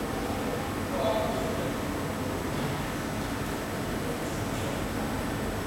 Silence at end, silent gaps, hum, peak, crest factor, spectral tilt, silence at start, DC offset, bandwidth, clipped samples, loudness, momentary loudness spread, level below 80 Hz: 0 s; none; none; -16 dBFS; 16 dB; -5 dB/octave; 0 s; under 0.1%; 16.5 kHz; under 0.1%; -31 LUFS; 4 LU; -44 dBFS